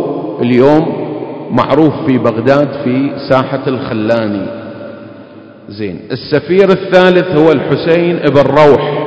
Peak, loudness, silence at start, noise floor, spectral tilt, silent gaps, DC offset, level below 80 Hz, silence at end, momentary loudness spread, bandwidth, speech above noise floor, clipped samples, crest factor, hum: 0 dBFS; -11 LUFS; 0 s; -34 dBFS; -8 dB/octave; none; under 0.1%; -46 dBFS; 0 s; 15 LU; 8 kHz; 24 dB; 2%; 12 dB; none